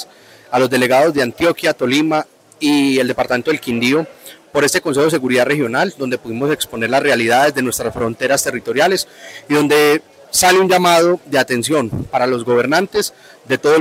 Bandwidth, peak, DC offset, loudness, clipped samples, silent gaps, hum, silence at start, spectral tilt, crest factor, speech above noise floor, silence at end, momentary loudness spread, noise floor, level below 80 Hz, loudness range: 16 kHz; -2 dBFS; under 0.1%; -15 LUFS; under 0.1%; none; none; 0 s; -3.5 dB/octave; 12 dB; 24 dB; 0 s; 9 LU; -39 dBFS; -52 dBFS; 3 LU